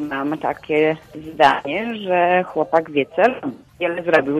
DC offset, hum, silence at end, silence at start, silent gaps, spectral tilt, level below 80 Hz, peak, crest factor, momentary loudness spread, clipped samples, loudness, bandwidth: under 0.1%; none; 0 s; 0 s; none; -6 dB/octave; -58 dBFS; -2 dBFS; 18 dB; 10 LU; under 0.1%; -19 LUFS; 13.5 kHz